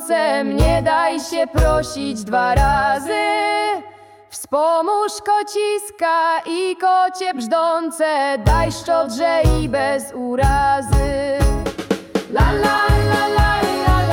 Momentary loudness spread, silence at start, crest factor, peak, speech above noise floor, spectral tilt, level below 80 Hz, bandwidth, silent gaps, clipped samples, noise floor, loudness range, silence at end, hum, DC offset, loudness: 7 LU; 0 s; 12 dB; -4 dBFS; 25 dB; -5.5 dB/octave; -24 dBFS; 17.5 kHz; none; under 0.1%; -42 dBFS; 2 LU; 0 s; none; under 0.1%; -18 LUFS